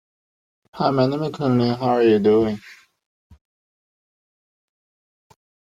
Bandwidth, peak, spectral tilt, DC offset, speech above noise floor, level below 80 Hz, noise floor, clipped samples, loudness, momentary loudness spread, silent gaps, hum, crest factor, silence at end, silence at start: 7.6 kHz; -4 dBFS; -8 dB/octave; under 0.1%; over 72 dB; -58 dBFS; under -90 dBFS; under 0.1%; -19 LUFS; 8 LU; none; none; 20 dB; 2.9 s; 0.75 s